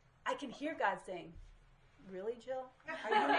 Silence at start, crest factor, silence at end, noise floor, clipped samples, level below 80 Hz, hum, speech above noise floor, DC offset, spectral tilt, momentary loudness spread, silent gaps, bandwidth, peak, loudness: 0.25 s; 20 dB; 0 s; -64 dBFS; under 0.1%; -66 dBFS; none; 26 dB; under 0.1%; -4 dB/octave; 15 LU; none; 11 kHz; -18 dBFS; -40 LUFS